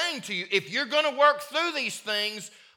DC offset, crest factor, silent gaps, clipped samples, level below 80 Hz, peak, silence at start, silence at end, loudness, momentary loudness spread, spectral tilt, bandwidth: under 0.1%; 20 dB; none; under 0.1%; -88 dBFS; -8 dBFS; 0 s; 0.3 s; -25 LUFS; 9 LU; -2 dB/octave; 19 kHz